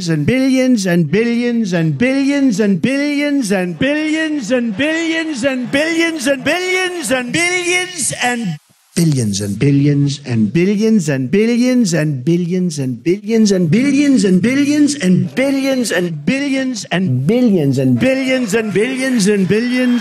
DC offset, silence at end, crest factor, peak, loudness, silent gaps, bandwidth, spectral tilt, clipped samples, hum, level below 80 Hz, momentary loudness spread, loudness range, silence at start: under 0.1%; 0 s; 10 dB; -4 dBFS; -14 LUFS; none; 14.5 kHz; -5.5 dB/octave; under 0.1%; none; -52 dBFS; 5 LU; 2 LU; 0 s